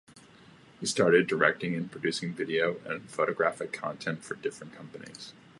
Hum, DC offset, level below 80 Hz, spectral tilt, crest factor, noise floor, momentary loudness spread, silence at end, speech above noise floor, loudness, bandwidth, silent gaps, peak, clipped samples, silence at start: none; under 0.1%; -74 dBFS; -4.5 dB/octave; 24 dB; -55 dBFS; 21 LU; 0.3 s; 25 dB; -29 LUFS; 11.5 kHz; none; -8 dBFS; under 0.1%; 0.15 s